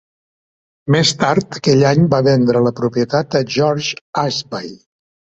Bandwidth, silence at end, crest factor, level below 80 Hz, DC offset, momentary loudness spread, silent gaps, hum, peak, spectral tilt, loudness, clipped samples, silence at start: 8.2 kHz; 0.55 s; 14 dB; -52 dBFS; under 0.1%; 10 LU; 4.01-4.13 s; none; -2 dBFS; -5.5 dB/octave; -15 LUFS; under 0.1%; 0.85 s